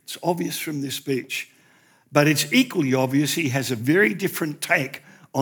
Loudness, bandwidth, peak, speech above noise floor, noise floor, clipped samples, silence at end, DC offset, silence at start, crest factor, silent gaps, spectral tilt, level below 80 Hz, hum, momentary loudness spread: -22 LUFS; over 20 kHz; -4 dBFS; 35 dB; -57 dBFS; under 0.1%; 0 s; under 0.1%; 0.1 s; 18 dB; none; -4.5 dB/octave; -80 dBFS; none; 11 LU